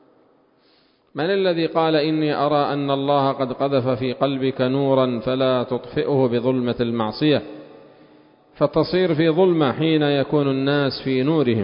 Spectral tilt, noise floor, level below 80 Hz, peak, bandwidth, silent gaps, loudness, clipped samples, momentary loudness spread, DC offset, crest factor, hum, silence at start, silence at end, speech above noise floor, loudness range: -11.5 dB/octave; -59 dBFS; -56 dBFS; -4 dBFS; 5.4 kHz; none; -20 LUFS; under 0.1%; 5 LU; under 0.1%; 16 dB; none; 1.15 s; 0 s; 39 dB; 2 LU